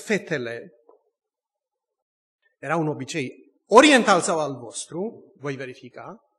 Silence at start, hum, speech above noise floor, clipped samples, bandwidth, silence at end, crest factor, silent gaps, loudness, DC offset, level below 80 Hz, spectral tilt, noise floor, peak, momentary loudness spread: 0 s; none; 65 dB; under 0.1%; 12.5 kHz; 0.25 s; 24 dB; 2.02-2.39 s; -21 LUFS; under 0.1%; -68 dBFS; -4 dB/octave; -87 dBFS; -2 dBFS; 23 LU